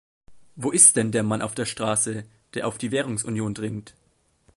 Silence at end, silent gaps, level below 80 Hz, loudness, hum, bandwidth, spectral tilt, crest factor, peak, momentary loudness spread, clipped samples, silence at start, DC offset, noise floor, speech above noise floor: 0.65 s; none; -58 dBFS; -22 LUFS; none; 12 kHz; -3.5 dB/octave; 24 dB; 0 dBFS; 18 LU; under 0.1%; 0.3 s; under 0.1%; -62 dBFS; 39 dB